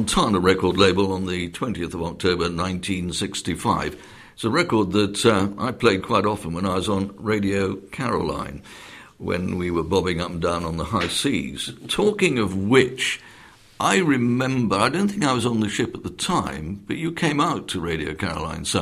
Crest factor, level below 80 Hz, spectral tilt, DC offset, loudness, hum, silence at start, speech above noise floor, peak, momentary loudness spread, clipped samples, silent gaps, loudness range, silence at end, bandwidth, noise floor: 22 dB; -46 dBFS; -5 dB/octave; under 0.1%; -22 LUFS; none; 0 s; 26 dB; 0 dBFS; 10 LU; under 0.1%; none; 4 LU; 0 s; 15.5 kHz; -48 dBFS